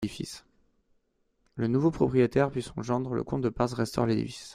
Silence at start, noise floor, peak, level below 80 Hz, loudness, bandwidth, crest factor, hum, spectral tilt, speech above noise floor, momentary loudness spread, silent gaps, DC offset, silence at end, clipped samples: 0 s; -73 dBFS; -10 dBFS; -54 dBFS; -28 LUFS; 14.5 kHz; 18 dB; none; -7 dB/octave; 45 dB; 13 LU; none; under 0.1%; 0 s; under 0.1%